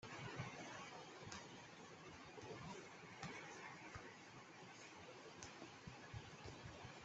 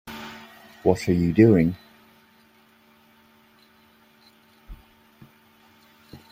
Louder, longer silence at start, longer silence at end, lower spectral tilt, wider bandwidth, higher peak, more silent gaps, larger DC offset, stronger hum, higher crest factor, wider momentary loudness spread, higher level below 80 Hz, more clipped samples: second, -56 LUFS vs -20 LUFS; about the same, 0 s vs 0.05 s; second, 0 s vs 0.15 s; second, -4 dB/octave vs -8 dB/octave; second, 8.2 kHz vs 16 kHz; second, -32 dBFS vs -2 dBFS; neither; neither; neither; about the same, 24 dB vs 24 dB; second, 6 LU vs 25 LU; second, -76 dBFS vs -54 dBFS; neither